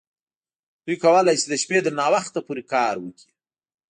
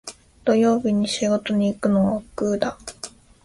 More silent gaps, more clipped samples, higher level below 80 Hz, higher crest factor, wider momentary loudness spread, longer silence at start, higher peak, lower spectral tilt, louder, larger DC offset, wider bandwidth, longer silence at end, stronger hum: neither; neither; second, -72 dBFS vs -52 dBFS; about the same, 18 dB vs 16 dB; second, 14 LU vs 17 LU; first, 0.85 s vs 0.05 s; about the same, -6 dBFS vs -6 dBFS; second, -3.5 dB/octave vs -5.5 dB/octave; about the same, -21 LUFS vs -21 LUFS; neither; second, 10 kHz vs 11.5 kHz; first, 0.8 s vs 0.35 s; neither